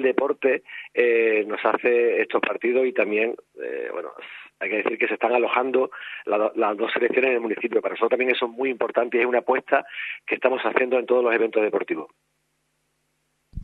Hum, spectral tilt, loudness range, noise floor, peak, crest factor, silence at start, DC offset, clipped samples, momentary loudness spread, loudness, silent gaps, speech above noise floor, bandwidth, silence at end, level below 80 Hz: none; -6.5 dB/octave; 3 LU; -72 dBFS; -4 dBFS; 20 dB; 0 s; under 0.1%; under 0.1%; 11 LU; -23 LUFS; none; 49 dB; 4.4 kHz; 0 s; -58 dBFS